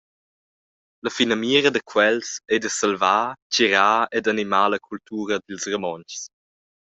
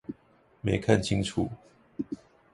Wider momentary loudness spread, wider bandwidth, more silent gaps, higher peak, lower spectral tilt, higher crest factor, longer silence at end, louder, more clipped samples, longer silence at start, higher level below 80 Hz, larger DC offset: second, 13 LU vs 22 LU; second, 8.2 kHz vs 11.5 kHz; first, 3.42-3.50 s vs none; first, -2 dBFS vs -6 dBFS; second, -2.5 dB/octave vs -6 dB/octave; about the same, 20 dB vs 24 dB; first, 0.6 s vs 0.4 s; first, -21 LUFS vs -29 LUFS; neither; first, 1.05 s vs 0.1 s; second, -66 dBFS vs -50 dBFS; neither